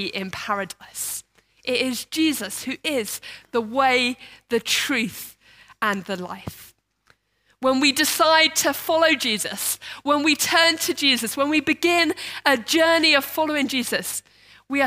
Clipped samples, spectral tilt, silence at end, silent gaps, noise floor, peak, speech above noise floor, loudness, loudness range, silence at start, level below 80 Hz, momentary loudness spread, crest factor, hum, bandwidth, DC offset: under 0.1%; -1.5 dB/octave; 0 s; none; -65 dBFS; -2 dBFS; 43 dB; -21 LUFS; 7 LU; 0 s; -64 dBFS; 14 LU; 22 dB; none; 16 kHz; under 0.1%